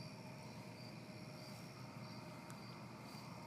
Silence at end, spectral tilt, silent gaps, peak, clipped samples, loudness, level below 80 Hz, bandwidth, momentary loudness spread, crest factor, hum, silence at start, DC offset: 0 s; -5 dB/octave; none; -36 dBFS; under 0.1%; -53 LUFS; -80 dBFS; 15.5 kHz; 1 LU; 18 dB; none; 0 s; under 0.1%